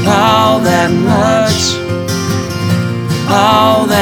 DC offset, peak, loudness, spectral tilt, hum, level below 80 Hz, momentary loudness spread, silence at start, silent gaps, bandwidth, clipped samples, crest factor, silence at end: under 0.1%; 0 dBFS; -11 LUFS; -5 dB/octave; none; -40 dBFS; 7 LU; 0 s; none; 19.5 kHz; under 0.1%; 10 dB; 0 s